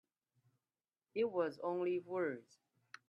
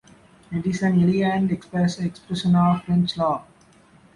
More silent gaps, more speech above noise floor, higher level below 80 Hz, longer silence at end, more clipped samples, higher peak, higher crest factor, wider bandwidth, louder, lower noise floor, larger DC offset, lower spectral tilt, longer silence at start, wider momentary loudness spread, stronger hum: neither; first, over 51 dB vs 33 dB; second, -88 dBFS vs -52 dBFS; about the same, 0.65 s vs 0.75 s; neither; second, -24 dBFS vs -8 dBFS; about the same, 18 dB vs 14 dB; second, 7 kHz vs 11 kHz; second, -40 LUFS vs -22 LUFS; first, under -90 dBFS vs -53 dBFS; neither; about the same, -7 dB/octave vs -7 dB/octave; first, 1.15 s vs 0.5 s; about the same, 11 LU vs 9 LU; neither